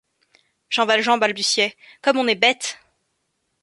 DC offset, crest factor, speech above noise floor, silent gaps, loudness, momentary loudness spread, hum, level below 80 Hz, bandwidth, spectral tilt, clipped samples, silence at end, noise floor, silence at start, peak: under 0.1%; 20 dB; 53 dB; none; -19 LUFS; 8 LU; none; -72 dBFS; 11.5 kHz; -1.5 dB/octave; under 0.1%; 0.9 s; -73 dBFS; 0.7 s; -2 dBFS